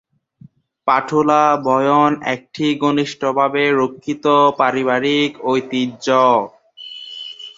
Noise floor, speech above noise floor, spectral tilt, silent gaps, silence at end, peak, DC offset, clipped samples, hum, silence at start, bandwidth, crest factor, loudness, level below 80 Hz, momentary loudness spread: -47 dBFS; 31 dB; -5.5 dB/octave; none; 0.05 s; 0 dBFS; under 0.1%; under 0.1%; none; 0.85 s; 7.8 kHz; 16 dB; -16 LUFS; -62 dBFS; 16 LU